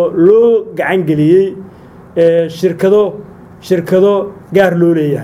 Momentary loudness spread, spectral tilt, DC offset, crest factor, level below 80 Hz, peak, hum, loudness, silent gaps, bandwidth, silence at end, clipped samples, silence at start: 9 LU; -7.5 dB/octave; under 0.1%; 12 dB; -50 dBFS; 0 dBFS; none; -11 LUFS; none; 15 kHz; 0 s; under 0.1%; 0 s